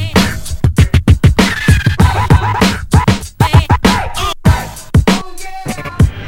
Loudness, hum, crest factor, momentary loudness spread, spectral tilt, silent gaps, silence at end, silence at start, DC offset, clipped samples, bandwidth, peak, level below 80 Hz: -12 LUFS; none; 12 dB; 8 LU; -5.5 dB/octave; none; 0 s; 0 s; under 0.1%; 0.5%; 16.5 kHz; 0 dBFS; -18 dBFS